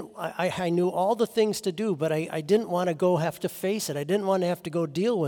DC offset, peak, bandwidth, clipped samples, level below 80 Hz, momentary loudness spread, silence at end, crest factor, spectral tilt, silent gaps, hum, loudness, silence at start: under 0.1%; -10 dBFS; 18 kHz; under 0.1%; -70 dBFS; 5 LU; 0 s; 16 dB; -5.5 dB/octave; none; none; -26 LUFS; 0 s